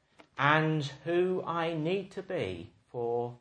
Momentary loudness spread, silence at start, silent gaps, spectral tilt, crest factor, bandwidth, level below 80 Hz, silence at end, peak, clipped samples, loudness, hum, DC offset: 12 LU; 0.35 s; none; -6.5 dB/octave; 22 dB; 9.4 kHz; -70 dBFS; 0.05 s; -10 dBFS; under 0.1%; -31 LUFS; none; under 0.1%